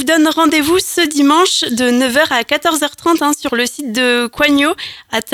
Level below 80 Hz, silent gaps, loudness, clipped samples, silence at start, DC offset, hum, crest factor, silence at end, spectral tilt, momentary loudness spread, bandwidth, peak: -50 dBFS; none; -13 LUFS; under 0.1%; 0 s; under 0.1%; none; 14 dB; 0 s; -2 dB/octave; 6 LU; 19.5 kHz; 0 dBFS